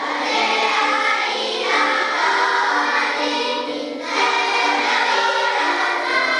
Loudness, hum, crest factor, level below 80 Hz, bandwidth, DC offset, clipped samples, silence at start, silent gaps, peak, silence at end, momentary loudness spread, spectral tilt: -18 LUFS; none; 14 dB; -76 dBFS; 11 kHz; under 0.1%; under 0.1%; 0 s; none; -4 dBFS; 0 s; 4 LU; -0.5 dB/octave